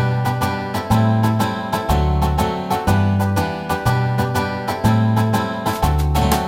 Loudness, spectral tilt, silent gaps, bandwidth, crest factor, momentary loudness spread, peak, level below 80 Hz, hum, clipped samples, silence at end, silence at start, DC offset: -19 LUFS; -6.5 dB/octave; none; 16.5 kHz; 16 dB; 5 LU; -2 dBFS; -28 dBFS; none; under 0.1%; 0 s; 0 s; under 0.1%